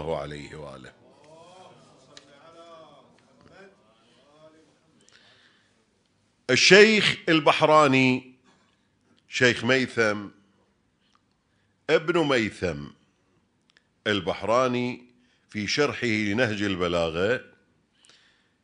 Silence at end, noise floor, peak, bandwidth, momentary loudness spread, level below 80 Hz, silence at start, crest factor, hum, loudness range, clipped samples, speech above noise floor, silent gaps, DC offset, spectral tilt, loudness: 1.2 s; -69 dBFS; -2 dBFS; 10.5 kHz; 21 LU; -60 dBFS; 0 s; 26 dB; none; 9 LU; under 0.1%; 46 dB; none; under 0.1%; -4 dB/octave; -22 LUFS